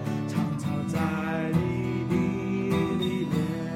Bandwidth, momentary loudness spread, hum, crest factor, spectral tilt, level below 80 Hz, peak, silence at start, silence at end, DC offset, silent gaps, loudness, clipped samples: 16 kHz; 3 LU; none; 16 dB; -7.5 dB/octave; -52 dBFS; -12 dBFS; 0 s; 0 s; under 0.1%; none; -28 LUFS; under 0.1%